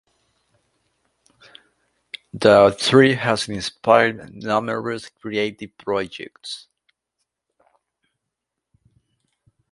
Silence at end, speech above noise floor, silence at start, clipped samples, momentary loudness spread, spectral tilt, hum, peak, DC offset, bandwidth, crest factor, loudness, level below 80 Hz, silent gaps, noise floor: 3.15 s; 63 dB; 2.35 s; under 0.1%; 20 LU; -5 dB/octave; none; 0 dBFS; under 0.1%; 11.5 kHz; 22 dB; -19 LUFS; -58 dBFS; none; -82 dBFS